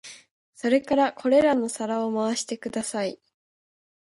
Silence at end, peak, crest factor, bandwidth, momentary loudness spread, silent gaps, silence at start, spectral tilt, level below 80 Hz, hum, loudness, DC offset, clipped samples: 0.9 s; -8 dBFS; 18 dB; 11.5 kHz; 10 LU; 0.31-0.53 s; 0.05 s; -4 dB/octave; -66 dBFS; none; -25 LUFS; under 0.1%; under 0.1%